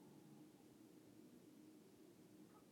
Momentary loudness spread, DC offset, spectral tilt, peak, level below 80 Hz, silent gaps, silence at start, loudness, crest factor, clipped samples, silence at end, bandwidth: 2 LU; under 0.1%; -5.5 dB/octave; -52 dBFS; under -90 dBFS; none; 0 s; -66 LUFS; 12 dB; under 0.1%; 0 s; 17.5 kHz